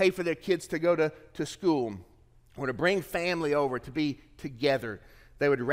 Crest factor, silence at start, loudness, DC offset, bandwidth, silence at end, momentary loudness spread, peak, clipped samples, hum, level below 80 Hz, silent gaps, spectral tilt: 18 dB; 0 s; -29 LUFS; under 0.1%; 16 kHz; 0 s; 11 LU; -12 dBFS; under 0.1%; none; -58 dBFS; none; -5.5 dB/octave